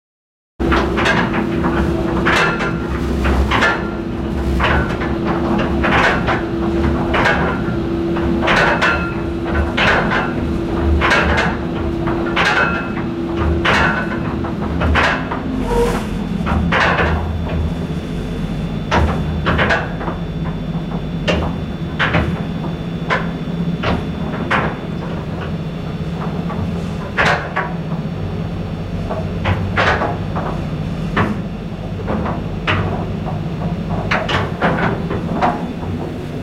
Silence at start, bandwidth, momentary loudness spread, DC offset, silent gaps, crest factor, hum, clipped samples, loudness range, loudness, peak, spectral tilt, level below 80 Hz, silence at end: 0.6 s; 13.5 kHz; 9 LU; under 0.1%; none; 16 dB; none; under 0.1%; 5 LU; -18 LUFS; -2 dBFS; -6.5 dB/octave; -28 dBFS; 0 s